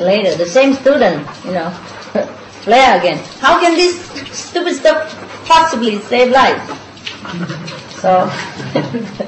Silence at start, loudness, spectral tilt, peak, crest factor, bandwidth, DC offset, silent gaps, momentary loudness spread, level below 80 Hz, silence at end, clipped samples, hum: 0 s; -13 LUFS; -4 dB/octave; 0 dBFS; 14 dB; 8.6 kHz; under 0.1%; none; 16 LU; -48 dBFS; 0 s; under 0.1%; none